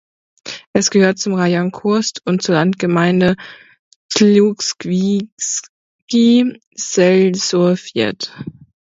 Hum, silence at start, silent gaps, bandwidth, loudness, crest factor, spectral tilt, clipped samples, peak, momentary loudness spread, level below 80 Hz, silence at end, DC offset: none; 0.45 s; 0.67-0.74 s, 3.79-4.09 s, 5.32-5.37 s, 5.69-6.08 s, 6.67-6.72 s; 8 kHz; -15 LUFS; 16 dB; -5 dB/octave; under 0.1%; 0 dBFS; 14 LU; -56 dBFS; 0.3 s; under 0.1%